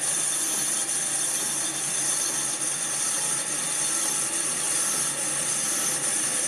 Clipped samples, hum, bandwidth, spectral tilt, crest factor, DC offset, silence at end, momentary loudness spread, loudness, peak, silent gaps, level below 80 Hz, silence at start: under 0.1%; none; 16 kHz; 0 dB/octave; 14 dB; under 0.1%; 0 s; 2 LU; -23 LUFS; -12 dBFS; none; -74 dBFS; 0 s